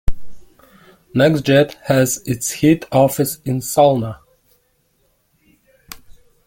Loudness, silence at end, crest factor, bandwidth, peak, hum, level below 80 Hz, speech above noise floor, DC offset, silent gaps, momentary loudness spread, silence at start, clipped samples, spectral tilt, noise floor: -16 LUFS; 0.35 s; 16 dB; 17 kHz; -2 dBFS; none; -36 dBFS; 47 dB; under 0.1%; none; 24 LU; 0.05 s; under 0.1%; -5.5 dB/octave; -62 dBFS